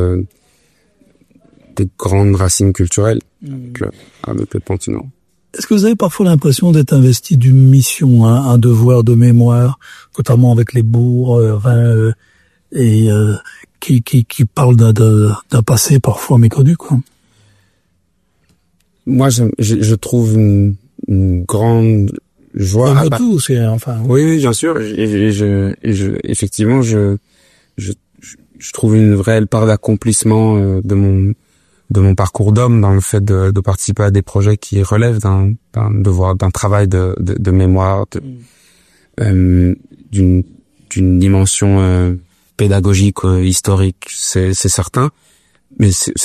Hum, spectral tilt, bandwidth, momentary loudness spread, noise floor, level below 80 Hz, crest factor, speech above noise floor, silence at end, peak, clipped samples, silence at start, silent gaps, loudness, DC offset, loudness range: none; -6.5 dB/octave; 14 kHz; 13 LU; -61 dBFS; -40 dBFS; 12 dB; 50 dB; 0 s; 0 dBFS; under 0.1%; 0 s; none; -12 LUFS; under 0.1%; 6 LU